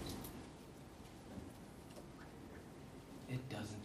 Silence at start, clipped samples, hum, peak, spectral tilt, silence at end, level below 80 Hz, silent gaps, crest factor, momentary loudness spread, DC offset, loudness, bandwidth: 0 s; under 0.1%; none; -32 dBFS; -5.5 dB/octave; 0 s; -64 dBFS; none; 20 dB; 9 LU; under 0.1%; -52 LUFS; 15.5 kHz